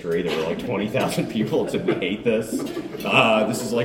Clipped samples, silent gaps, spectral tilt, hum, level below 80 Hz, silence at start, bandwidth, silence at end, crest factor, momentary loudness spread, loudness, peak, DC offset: under 0.1%; none; -5 dB/octave; none; -54 dBFS; 0 s; 17 kHz; 0 s; 20 dB; 9 LU; -22 LUFS; -2 dBFS; under 0.1%